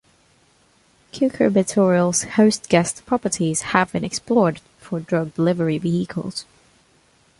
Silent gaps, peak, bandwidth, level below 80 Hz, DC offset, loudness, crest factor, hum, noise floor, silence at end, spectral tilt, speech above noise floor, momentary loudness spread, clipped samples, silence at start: none; -2 dBFS; 11.5 kHz; -56 dBFS; under 0.1%; -20 LUFS; 20 dB; none; -58 dBFS; 0.95 s; -5 dB/octave; 38 dB; 12 LU; under 0.1%; 1.15 s